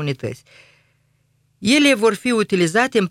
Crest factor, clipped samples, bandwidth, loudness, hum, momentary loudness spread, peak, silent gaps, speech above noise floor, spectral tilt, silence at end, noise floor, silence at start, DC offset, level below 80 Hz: 18 dB; under 0.1%; 15 kHz; -17 LUFS; 50 Hz at -45 dBFS; 15 LU; -2 dBFS; none; 45 dB; -4.5 dB/octave; 0 s; -63 dBFS; 0 s; under 0.1%; -60 dBFS